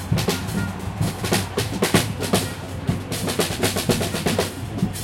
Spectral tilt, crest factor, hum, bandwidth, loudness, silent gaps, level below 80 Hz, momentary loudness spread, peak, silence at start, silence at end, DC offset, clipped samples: -4.5 dB/octave; 20 dB; none; 17 kHz; -23 LUFS; none; -42 dBFS; 7 LU; -4 dBFS; 0 s; 0 s; under 0.1%; under 0.1%